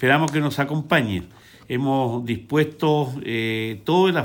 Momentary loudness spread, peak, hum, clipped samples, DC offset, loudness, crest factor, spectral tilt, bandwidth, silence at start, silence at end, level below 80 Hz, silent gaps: 8 LU; -4 dBFS; none; under 0.1%; under 0.1%; -22 LUFS; 18 dB; -6.5 dB/octave; 17 kHz; 0 s; 0 s; -56 dBFS; none